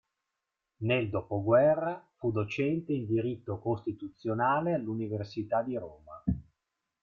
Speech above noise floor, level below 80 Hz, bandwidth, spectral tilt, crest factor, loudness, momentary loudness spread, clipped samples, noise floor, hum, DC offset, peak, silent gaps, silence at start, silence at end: 56 dB; -56 dBFS; 7 kHz; -8.5 dB/octave; 20 dB; -31 LUFS; 11 LU; under 0.1%; -86 dBFS; none; under 0.1%; -12 dBFS; none; 0.8 s; 0.6 s